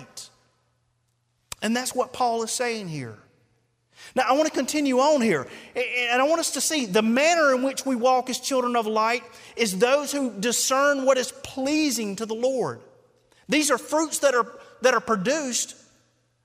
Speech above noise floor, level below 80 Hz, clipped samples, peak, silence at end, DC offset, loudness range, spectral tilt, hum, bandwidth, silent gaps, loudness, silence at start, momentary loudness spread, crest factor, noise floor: 47 dB; -68 dBFS; under 0.1%; -6 dBFS; 0.7 s; under 0.1%; 6 LU; -3 dB/octave; none; 16 kHz; none; -23 LUFS; 0 s; 11 LU; 18 dB; -71 dBFS